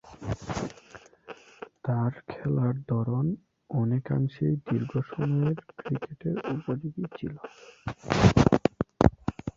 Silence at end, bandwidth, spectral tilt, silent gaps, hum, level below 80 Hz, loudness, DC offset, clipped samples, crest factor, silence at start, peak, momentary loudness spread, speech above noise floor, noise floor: 0.05 s; 7.8 kHz; -7.5 dB/octave; none; none; -44 dBFS; -28 LUFS; under 0.1%; under 0.1%; 24 dB; 0.05 s; -4 dBFS; 17 LU; 24 dB; -52 dBFS